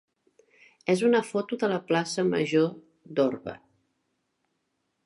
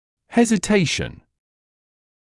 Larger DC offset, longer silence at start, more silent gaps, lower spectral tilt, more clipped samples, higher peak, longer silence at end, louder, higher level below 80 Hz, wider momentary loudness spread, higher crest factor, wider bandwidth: neither; first, 0.85 s vs 0.3 s; neither; about the same, -5.5 dB/octave vs -4.5 dB/octave; neither; second, -10 dBFS vs -4 dBFS; first, 1.5 s vs 1.1 s; second, -26 LUFS vs -19 LUFS; second, -74 dBFS vs -48 dBFS; first, 11 LU vs 8 LU; about the same, 18 dB vs 18 dB; about the same, 11.5 kHz vs 12 kHz